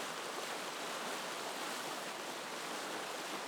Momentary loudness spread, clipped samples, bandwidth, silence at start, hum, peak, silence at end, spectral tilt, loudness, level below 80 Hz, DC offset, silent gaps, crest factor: 2 LU; under 0.1%; over 20 kHz; 0 s; none; -26 dBFS; 0 s; -1 dB/octave; -41 LUFS; under -90 dBFS; under 0.1%; none; 16 dB